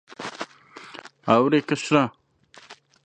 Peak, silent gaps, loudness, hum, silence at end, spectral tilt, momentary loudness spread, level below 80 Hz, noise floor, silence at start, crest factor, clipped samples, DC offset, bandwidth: -2 dBFS; none; -22 LUFS; none; 0.3 s; -5.5 dB/octave; 23 LU; -68 dBFS; -53 dBFS; 0.1 s; 22 dB; under 0.1%; under 0.1%; 9.6 kHz